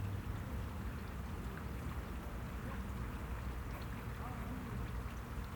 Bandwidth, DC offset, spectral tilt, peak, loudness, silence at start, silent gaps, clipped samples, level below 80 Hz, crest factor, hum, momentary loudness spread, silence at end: over 20 kHz; under 0.1%; -6.5 dB/octave; -30 dBFS; -45 LUFS; 0 s; none; under 0.1%; -46 dBFS; 12 dB; none; 2 LU; 0 s